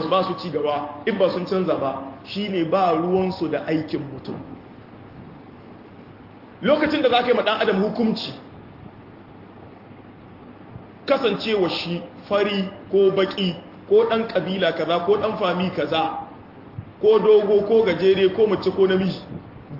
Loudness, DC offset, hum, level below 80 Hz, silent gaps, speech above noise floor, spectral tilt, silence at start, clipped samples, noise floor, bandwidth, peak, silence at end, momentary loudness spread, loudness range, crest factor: -21 LUFS; under 0.1%; none; -58 dBFS; none; 23 dB; -7.5 dB/octave; 0 s; under 0.1%; -44 dBFS; 5.8 kHz; -4 dBFS; 0 s; 20 LU; 9 LU; 18 dB